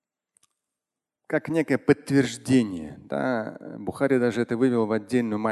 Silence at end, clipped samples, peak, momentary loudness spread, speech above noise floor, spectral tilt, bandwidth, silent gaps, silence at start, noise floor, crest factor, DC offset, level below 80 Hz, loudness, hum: 0 s; under 0.1%; -6 dBFS; 10 LU; 64 dB; -6.5 dB/octave; 12.5 kHz; none; 1.3 s; -88 dBFS; 20 dB; under 0.1%; -60 dBFS; -25 LUFS; none